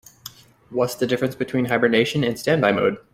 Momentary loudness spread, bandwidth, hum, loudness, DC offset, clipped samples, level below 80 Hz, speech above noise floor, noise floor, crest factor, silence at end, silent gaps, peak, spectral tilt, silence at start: 16 LU; 16.5 kHz; none; -21 LUFS; under 0.1%; under 0.1%; -58 dBFS; 23 dB; -44 dBFS; 20 dB; 0.15 s; none; -2 dBFS; -5.5 dB/octave; 0.25 s